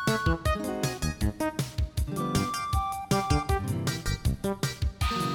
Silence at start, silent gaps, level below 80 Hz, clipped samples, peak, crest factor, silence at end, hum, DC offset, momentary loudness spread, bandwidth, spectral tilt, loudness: 0 s; none; -34 dBFS; under 0.1%; -12 dBFS; 16 dB; 0 s; none; under 0.1%; 5 LU; 19.5 kHz; -5 dB/octave; -29 LUFS